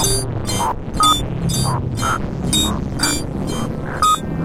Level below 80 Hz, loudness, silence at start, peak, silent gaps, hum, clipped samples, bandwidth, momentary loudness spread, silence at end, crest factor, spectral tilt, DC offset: -30 dBFS; -18 LUFS; 0 s; -2 dBFS; none; none; under 0.1%; 16.5 kHz; 8 LU; 0 s; 16 dB; -3.5 dB/octave; under 0.1%